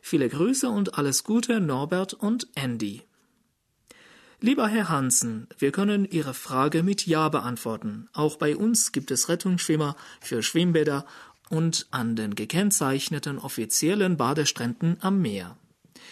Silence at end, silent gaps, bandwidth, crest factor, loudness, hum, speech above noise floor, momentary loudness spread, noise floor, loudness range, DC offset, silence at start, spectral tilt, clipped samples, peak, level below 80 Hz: 0 s; none; 13.5 kHz; 16 dB; -25 LUFS; none; 46 dB; 9 LU; -71 dBFS; 3 LU; under 0.1%; 0.05 s; -4.5 dB/octave; under 0.1%; -8 dBFS; -68 dBFS